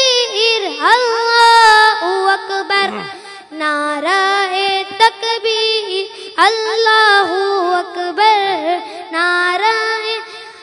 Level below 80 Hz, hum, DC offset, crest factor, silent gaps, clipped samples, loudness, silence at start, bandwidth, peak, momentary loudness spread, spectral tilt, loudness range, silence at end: -62 dBFS; none; under 0.1%; 14 dB; none; 0.2%; -13 LUFS; 0 s; 12 kHz; 0 dBFS; 12 LU; -0.5 dB/octave; 4 LU; 0 s